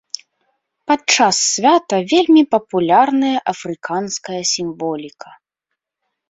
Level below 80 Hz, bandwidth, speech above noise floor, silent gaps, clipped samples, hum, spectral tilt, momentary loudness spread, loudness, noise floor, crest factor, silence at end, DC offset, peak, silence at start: -64 dBFS; 8 kHz; 63 dB; none; under 0.1%; none; -3 dB/octave; 14 LU; -15 LUFS; -79 dBFS; 16 dB; 1.2 s; under 0.1%; 0 dBFS; 0.9 s